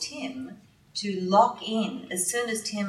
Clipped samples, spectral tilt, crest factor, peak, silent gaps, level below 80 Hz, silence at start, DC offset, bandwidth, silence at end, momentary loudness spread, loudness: under 0.1%; -3.5 dB/octave; 22 dB; -6 dBFS; none; -72 dBFS; 0 s; under 0.1%; 16 kHz; 0 s; 15 LU; -27 LUFS